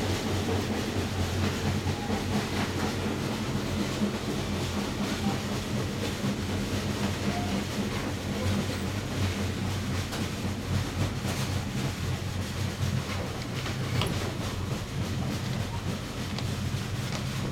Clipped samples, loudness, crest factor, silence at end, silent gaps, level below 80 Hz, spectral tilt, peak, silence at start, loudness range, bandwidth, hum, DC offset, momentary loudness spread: under 0.1%; -31 LUFS; 18 dB; 0 s; none; -44 dBFS; -5 dB/octave; -12 dBFS; 0 s; 2 LU; 17 kHz; none; under 0.1%; 3 LU